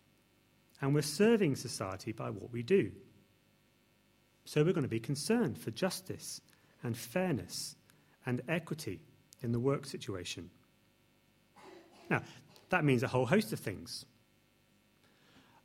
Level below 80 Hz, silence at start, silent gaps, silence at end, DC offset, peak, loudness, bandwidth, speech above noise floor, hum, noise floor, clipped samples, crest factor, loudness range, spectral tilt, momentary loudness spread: -72 dBFS; 0.8 s; none; 1.6 s; under 0.1%; -14 dBFS; -35 LUFS; 16.5 kHz; 36 dB; 50 Hz at -60 dBFS; -70 dBFS; under 0.1%; 24 dB; 6 LU; -5.5 dB/octave; 15 LU